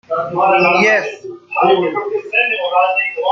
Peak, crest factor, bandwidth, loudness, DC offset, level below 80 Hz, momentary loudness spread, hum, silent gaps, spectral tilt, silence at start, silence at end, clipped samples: -2 dBFS; 14 dB; 7.6 kHz; -14 LUFS; under 0.1%; -64 dBFS; 10 LU; none; none; -4.5 dB/octave; 0.1 s; 0 s; under 0.1%